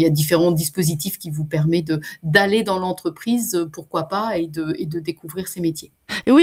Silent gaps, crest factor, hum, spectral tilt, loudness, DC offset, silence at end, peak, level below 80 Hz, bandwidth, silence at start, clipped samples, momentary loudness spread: none; 20 dB; none; -5 dB/octave; -21 LUFS; under 0.1%; 0 s; 0 dBFS; -54 dBFS; 16.5 kHz; 0 s; under 0.1%; 10 LU